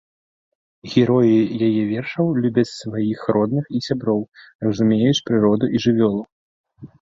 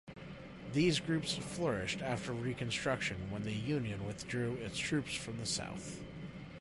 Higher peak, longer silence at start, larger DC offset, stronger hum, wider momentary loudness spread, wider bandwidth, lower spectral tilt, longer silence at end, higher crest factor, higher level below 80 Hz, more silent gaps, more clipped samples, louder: first, -2 dBFS vs -20 dBFS; first, 0.85 s vs 0.05 s; neither; neither; second, 8 LU vs 14 LU; second, 7.8 kHz vs 11.5 kHz; first, -7 dB/octave vs -4.5 dB/octave; first, 0.15 s vs 0 s; about the same, 16 dB vs 18 dB; about the same, -56 dBFS vs -58 dBFS; first, 4.55-4.59 s, 6.32-6.64 s vs none; neither; first, -19 LUFS vs -37 LUFS